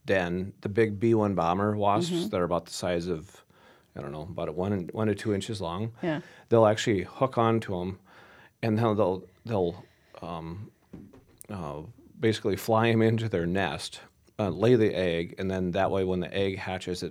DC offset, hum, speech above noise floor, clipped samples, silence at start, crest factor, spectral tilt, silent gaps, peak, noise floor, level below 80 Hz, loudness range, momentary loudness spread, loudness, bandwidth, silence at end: under 0.1%; none; 29 dB; under 0.1%; 0.05 s; 22 dB; -6.5 dB/octave; none; -6 dBFS; -57 dBFS; -58 dBFS; 6 LU; 15 LU; -28 LUFS; 15.5 kHz; 0 s